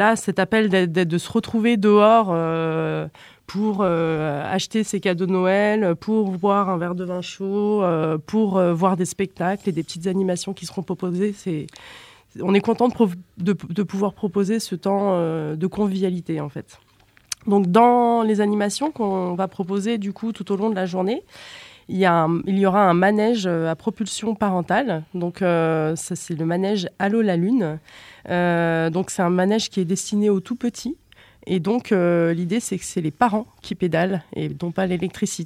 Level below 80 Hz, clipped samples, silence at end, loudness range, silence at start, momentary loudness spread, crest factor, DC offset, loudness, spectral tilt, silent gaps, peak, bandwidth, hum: -58 dBFS; under 0.1%; 0 s; 4 LU; 0 s; 11 LU; 18 dB; under 0.1%; -21 LUFS; -6 dB/octave; none; -2 dBFS; 14.5 kHz; none